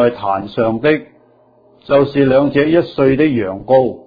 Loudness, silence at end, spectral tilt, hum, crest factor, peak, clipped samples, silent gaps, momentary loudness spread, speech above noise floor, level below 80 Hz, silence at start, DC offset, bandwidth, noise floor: -14 LUFS; 0.05 s; -9.5 dB/octave; none; 14 dB; 0 dBFS; under 0.1%; none; 7 LU; 37 dB; -46 dBFS; 0 s; under 0.1%; 5 kHz; -50 dBFS